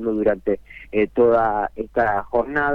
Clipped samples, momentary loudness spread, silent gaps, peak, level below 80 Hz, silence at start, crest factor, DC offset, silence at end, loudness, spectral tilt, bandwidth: under 0.1%; 9 LU; none; -6 dBFS; -46 dBFS; 0 s; 14 dB; under 0.1%; 0 s; -21 LUFS; -8.5 dB/octave; 5.2 kHz